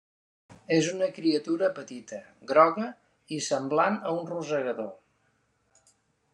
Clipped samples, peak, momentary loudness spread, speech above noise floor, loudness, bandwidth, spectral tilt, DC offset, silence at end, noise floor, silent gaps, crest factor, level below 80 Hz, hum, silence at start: under 0.1%; -6 dBFS; 18 LU; 44 dB; -27 LUFS; 11 kHz; -4.5 dB/octave; under 0.1%; 1.4 s; -71 dBFS; none; 22 dB; -78 dBFS; none; 0.5 s